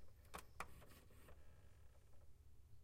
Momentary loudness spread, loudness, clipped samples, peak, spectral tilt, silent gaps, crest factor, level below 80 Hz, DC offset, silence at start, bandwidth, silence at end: 13 LU; -61 LUFS; under 0.1%; -36 dBFS; -4 dB/octave; none; 24 dB; -68 dBFS; under 0.1%; 0 s; 16 kHz; 0 s